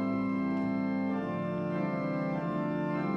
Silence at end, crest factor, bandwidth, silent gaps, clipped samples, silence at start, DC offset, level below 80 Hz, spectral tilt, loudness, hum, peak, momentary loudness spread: 0 s; 10 dB; 6.4 kHz; none; under 0.1%; 0 s; under 0.1%; -64 dBFS; -9.5 dB/octave; -32 LUFS; none; -20 dBFS; 2 LU